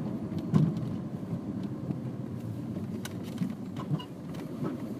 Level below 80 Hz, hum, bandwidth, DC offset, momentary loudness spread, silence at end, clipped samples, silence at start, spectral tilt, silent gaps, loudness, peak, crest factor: -62 dBFS; none; 15 kHz; under 0.1%; 10 LU; 0 s; under 0.1%; 0 s; -8 dB/octave; none; -34 LUFS; -10 dBFS; 24 dB